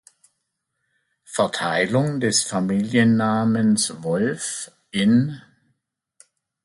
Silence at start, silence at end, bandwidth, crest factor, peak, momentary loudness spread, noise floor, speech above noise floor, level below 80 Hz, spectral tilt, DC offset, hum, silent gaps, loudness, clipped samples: 1.3 s; 1.25 s; 11.5 kHz; 18 dB; -6 dBFS; 11 LU; -77 dBFS; 57 dB; -62 dBFS; -4.5 dB/octave; under 0.1%; none; none; -21 LUFS; under 0.1%